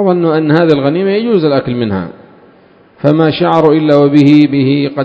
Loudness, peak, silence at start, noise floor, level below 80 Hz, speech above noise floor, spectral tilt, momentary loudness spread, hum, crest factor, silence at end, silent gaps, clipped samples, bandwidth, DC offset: -10 LUFS; 0 dBFS; 0 s; -43 dBFS; -48 dBFS; 34 dB; -9 dB/octave; 9 LU; none; 10 dB; 0 s; none; 0.7%; 8 kHz; under 0.1%